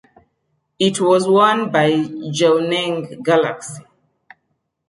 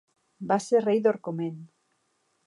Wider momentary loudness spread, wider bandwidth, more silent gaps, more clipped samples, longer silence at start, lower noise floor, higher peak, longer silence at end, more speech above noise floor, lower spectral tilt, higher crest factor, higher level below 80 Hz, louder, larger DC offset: second, 10 LU vs 16 LU; about the same, 11.5 kHz vs 11.5 kHz; neither; neither; first, 0.8 s vs 0.4 s; about the same, -71 dBFS vs -73 dBFS; first, -2 dBFS vs -10 dBFS; first, 1.1 s vs 0.8 s; first, 55 dB vs 47 dB; second, -5 dB/octave vs -6.5 dB/octave; about the same, 16 dB vs 18 dB; first, -66 dBFS vs -80 dBFS; first, -16 LUFS vs -26 LUFS; neither